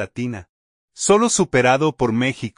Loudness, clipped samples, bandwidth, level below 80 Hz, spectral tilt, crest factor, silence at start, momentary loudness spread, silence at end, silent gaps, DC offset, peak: -18 LUFS; under 0.1%; 11 kHz; -50 dBFS; -4 dB/octave; 18 dB; 0 s; 13 LU; 0.1 s; 0.49-0.88 s; under 0.1%; -2 dBFS